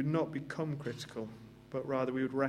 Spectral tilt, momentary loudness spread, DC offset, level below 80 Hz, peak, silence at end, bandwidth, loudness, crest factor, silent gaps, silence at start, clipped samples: -7 dB/octave; 11 LU; under 0.1%; -70 dBFS; -16 dBFS; 0 s; 13.5 kHz; -38 LUFS; 20 dB; none; 0 s; under 0.1%